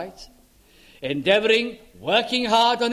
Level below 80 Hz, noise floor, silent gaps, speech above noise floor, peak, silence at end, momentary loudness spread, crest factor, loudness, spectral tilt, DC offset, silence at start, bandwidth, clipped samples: -58 dBFS; -54 dBFS; none; 33 dB; -4 dBFS; 0 s; 16 LU; 18 dB; -20 LUFS; -3.5 dB/octave; under 0.1%; 0 s; 15 kHz; under 0.1%